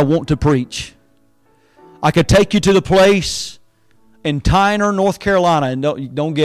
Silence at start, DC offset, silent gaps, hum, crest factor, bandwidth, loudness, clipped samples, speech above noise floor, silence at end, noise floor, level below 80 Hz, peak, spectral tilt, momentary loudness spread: 0 s; under 0.1%; none; none; 10 dB; 15.5 kHz; -15 LUFS; under 0.1%; 43 dB; 0 s; -57 dBFS; -32 dBFS; -4 dBFS; -5.5 dB/octave; 12 LU